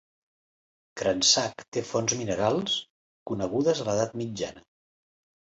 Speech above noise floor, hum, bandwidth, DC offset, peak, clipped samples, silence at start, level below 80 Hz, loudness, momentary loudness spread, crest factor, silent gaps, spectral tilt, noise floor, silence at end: over 63 dB; none; 8.2 kHz; under 0.1%; -8 dBFS; under 0.1%; 0.95 s; -60 dBFS; -27 LUFS; 14 LU; 20 dB; 1.68-1.72 s, 2.90-3.26 s; -3 dB/octave; under -90 dBFS; 0.8 s